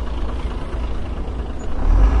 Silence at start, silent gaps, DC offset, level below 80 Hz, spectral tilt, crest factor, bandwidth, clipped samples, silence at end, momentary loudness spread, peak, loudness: 0 s; none; under 0.1%; -20 dBFS; -7.5 dB/octave; 16 dB; 7.4 kHz; under 0.1%; 0 s; 10 LU; -4 dBFS; -25 LUFS